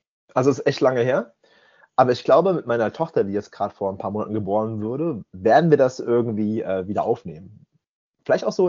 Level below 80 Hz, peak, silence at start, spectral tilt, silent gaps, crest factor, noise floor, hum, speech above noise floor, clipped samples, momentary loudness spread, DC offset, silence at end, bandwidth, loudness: -64 dBFS; -2 dBFS; 0.35 s; -6 dB/octave; 7.89-8.14 s; 20 dB; -56 dBFS; none; 35 dB; under 0.1%; 10 LU; under 0.1%; 0 s; 7.4 kHz; -21 LUFS